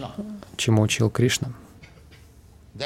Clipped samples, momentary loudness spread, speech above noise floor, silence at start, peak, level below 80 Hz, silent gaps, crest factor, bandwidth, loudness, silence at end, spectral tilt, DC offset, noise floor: under 0.1%; 16 LU; 29 dB; 0 s; -6 dBFS; -52 dBFS; none; 18 dB; 15.5 kHz; -23 LUFS; 0 s; -5 dB/octave; under 0.1%; -50 dBFS